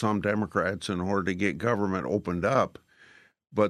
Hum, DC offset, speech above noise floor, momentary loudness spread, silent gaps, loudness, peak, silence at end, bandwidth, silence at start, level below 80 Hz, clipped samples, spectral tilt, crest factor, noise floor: none; under 0.1%; 30 dB; 4 LU; none; -28 LUFS; -8 dBFS; 0 s; 12.5 kHz; 0 s; -62 dBFS; under 0.1%; -6.5 dB/octave; 20 dB; -57 dBFS